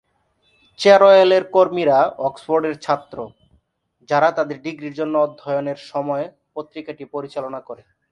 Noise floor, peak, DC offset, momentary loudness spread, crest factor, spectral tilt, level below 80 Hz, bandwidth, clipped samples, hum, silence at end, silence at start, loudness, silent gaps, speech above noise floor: -64 dBFS; 0 dBFS; under 0.1%; 21 LU; 18 dB; -5.5 dB/octave; -66 dBFS; 9.4 kHz; under 0.1%; none; 0.4 s; 0.8 s; -18 LUFS; none; 46 dB